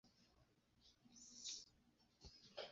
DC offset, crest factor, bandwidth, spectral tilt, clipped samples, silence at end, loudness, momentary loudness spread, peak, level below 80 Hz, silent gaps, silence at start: under 0.1%; 22 dB; 7.6 kHz; -1 dB/octave; under 0.1%; 0 s; -56 LUFS; 15 LU; -38 dBFS; -78 dBFS; none; 0.05 s